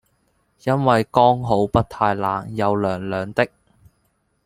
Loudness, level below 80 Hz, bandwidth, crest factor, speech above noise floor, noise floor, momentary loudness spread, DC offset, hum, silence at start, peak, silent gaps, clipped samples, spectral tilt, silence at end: -20 LUFS; -46 dBFS; 15.5 kHz; 20 dB; 48 dB; -67 dBFS; 8 LU; under 0.1%; none; 0.65 s; 0 dBFS; none; under 0.1%; -7.5 dB/octave; 1 s